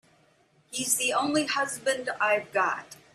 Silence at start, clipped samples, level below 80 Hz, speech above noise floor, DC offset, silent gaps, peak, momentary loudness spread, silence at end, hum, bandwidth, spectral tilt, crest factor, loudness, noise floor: 0.7 s; under 0.1%; -72 dBFS; 36 dB; under 0.1%; none; -10 dBFS; 7 LU; 0.2 s; none; 15.5 kHz; -1.5 dB/octave; 20 dB; -27 LUFS; -64 dBFS